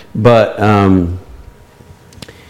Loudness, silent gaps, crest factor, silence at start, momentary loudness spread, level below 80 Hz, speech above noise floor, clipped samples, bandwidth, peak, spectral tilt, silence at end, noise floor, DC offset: -11 LUFS; none; 14 dB; 0.15 s; 11 LU; -38 dBFS; 30 dB; under 0.1%; 13 kHz; 0 dBFS; -8 dB/octave; 1.15 s; -40 dBFS; under 0.1%